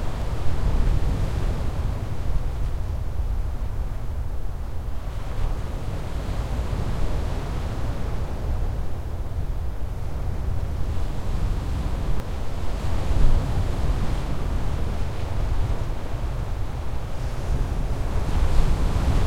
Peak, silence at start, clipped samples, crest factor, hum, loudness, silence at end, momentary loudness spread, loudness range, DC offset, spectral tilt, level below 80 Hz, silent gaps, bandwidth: -4 dBFS; 0 s; under 0.1%; 18 dB; none; -29 LUFS; 0 s; 7 LU; 4 LU; under 0.1%; -7 dB/octave; -26 dBFS; none; 13 kHz